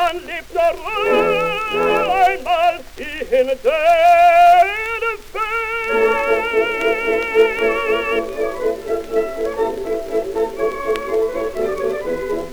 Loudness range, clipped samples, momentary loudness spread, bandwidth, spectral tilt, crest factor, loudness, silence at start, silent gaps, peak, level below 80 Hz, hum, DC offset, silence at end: 7 LU; under 0.1%; 11 LU; over 20 kHz; -4 dB/octave; 16 dB; -17 LUFS; 0 s; none; -2 dBFS; -42 dBFS; none; under 0.1%; 0 s